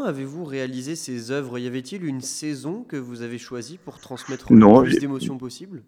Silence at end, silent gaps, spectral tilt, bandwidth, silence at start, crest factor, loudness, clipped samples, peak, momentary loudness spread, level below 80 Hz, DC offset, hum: 0.05 s; none; -6.5 dB/octave; 14 kHz; 0 s; 22 dB; -20 LUFS; under 0.1%; 0 dBFS; 22 LU; -54 dBFS; under 0.1%; none